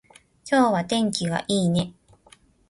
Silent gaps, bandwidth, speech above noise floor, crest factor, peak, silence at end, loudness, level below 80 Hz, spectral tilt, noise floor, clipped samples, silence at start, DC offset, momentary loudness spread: none; 11.5 kHz; 34 dB; 18 dB; -6 dBFS; 0.8 s; -23 LUFS; -56 dBFS; -5 dB/octave; -56 dBFS; under 0.1%; 0.45 s; under 0.1%; 9 LU